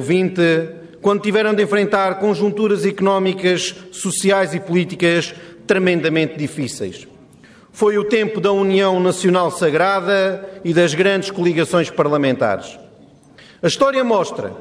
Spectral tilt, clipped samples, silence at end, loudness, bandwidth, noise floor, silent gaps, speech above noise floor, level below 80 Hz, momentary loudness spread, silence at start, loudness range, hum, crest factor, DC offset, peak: -5 dB/octave; under 0.1%; 0 s; -17 LUFS; 11 kHz; -46 dBFS; none; 29 dB; -60 dBFS; 9 LU; 0 s; 3 LU; none; 14 dB; under 0.1%; -4 dBFS